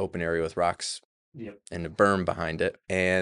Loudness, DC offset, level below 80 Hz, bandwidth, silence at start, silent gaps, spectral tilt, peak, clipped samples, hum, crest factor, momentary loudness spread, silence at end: -27 LUFS; under 0.1%; -54 dBFS; 11.5 kHz; 0 s; 1.05-1.32 s; -5 dB/octave; -8 dBFS; under 0.1%; none; 20 dB; 17 LU; 0 s